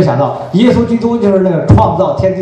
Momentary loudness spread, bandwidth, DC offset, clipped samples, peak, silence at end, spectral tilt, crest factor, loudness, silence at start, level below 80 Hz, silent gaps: 4 LU; 9 kHz; under 0.1%; 0.8%; 0 dBFS; 0 s; -8.5 dB/octave; 10 dB; -10 LUFS; 0 s; -30 dBFS; none